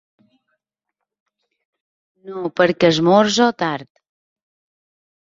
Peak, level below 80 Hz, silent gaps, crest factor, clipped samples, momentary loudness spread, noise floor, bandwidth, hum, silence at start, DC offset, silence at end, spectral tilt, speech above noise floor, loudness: -2 dBFS; -62 dBFS; none; 20 dB; under 0.1%; 15 LU; -81 dBFS; 7.8 kHz; none; 2.25 s; under 0.1%; 1.4 s; -5 dB/octave; 65 dB; -16 LUFS